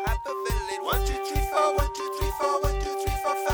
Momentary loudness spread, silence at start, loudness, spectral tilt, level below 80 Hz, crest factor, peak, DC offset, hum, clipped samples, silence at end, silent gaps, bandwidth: 6 LU; 0 s; -27 LUFS; -4.5 dB/octave; -32 dBFS; 16 dB; -10 dBFS; under 0.1%; none; under 0.1%; 0 s; none; over 20 kHz